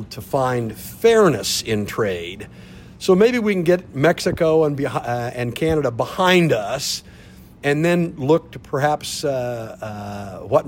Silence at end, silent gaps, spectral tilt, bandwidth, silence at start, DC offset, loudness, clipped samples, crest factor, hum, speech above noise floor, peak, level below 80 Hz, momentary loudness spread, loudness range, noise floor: 0 s; none; -5 dB/octave; 16.5 kHz; 0 s; under 0.1%; -19 LUFS; under 0.1%; 16 dB; none; 24 dB; -4 dBFS; -48 dBFS; 14 LU; 3 LU; -43 dBFS